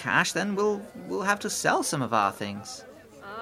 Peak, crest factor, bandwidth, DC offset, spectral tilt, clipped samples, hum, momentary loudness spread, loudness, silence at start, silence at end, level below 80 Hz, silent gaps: -8 dBFS; 20 dB; 16 kHz; under 0.1%; -3.5 dB/octave; under 0.1%; none; 16 LU; -27 LUFS; 0 s; 0 s; -68 dBFS; none